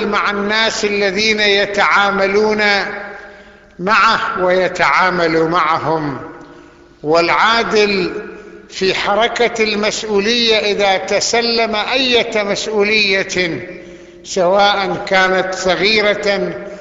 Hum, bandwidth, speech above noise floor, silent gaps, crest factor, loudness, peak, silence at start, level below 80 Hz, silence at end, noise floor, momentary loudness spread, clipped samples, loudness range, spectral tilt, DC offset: none; 8 kHz; 27 dB; none; 14 dB; -14 LUFS; 0 dBFS; 0 s; -48 dBFS; 0 s; -41 dBFS; 11 LU; under 0.1%; 2 LU; -3 dB/octave; under 0.1%